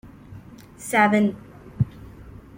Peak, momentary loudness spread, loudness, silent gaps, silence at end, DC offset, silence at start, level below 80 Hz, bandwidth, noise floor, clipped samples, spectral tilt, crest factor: -6 dBFS; 26 LU; -22 LUFS; none; 0.25 s; under 0.1%; 0.05 s; -50 dBFS; 17 kHz; -43 dBFS; under 0.1%; -6 dB/octave; 20 dB